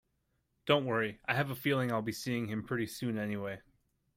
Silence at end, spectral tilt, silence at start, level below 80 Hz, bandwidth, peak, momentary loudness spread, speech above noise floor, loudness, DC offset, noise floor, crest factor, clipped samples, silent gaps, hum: 0.55 s; -5.5 dB/octave; 0.65 s; -68 dBFS; 16 kHz; -14 dBFS; 9 LU; 45 dB; -34 LUFS; under 0.1%; -79 dBFS; 20 dB; under 0.1%; none; none